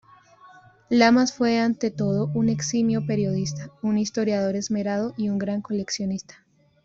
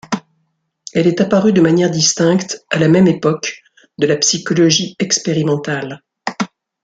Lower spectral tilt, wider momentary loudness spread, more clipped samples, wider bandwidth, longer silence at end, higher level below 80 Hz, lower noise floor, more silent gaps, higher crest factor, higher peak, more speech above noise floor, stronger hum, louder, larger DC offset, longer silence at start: about the same, -5.5 dB/octave vs -4.5 dB/octave; second, 9 LU vs 13 LU; neither; second, 7.8 kHz vs 9.4 kHz; first, 0.65 s vs 0.4 s; about the same, -60 dBFS vs -56 dBFS; second, -51 dBFS vs -66 dBFS; neither; about the same, 20 dB vs 16 dB; second, -4 dBFS vs 0 dBFS; second, 28 dB vs 53 dB; neither; second, -24 LUFS vs -15 LUFS; neither; first, 0.45 s vs 0.1 s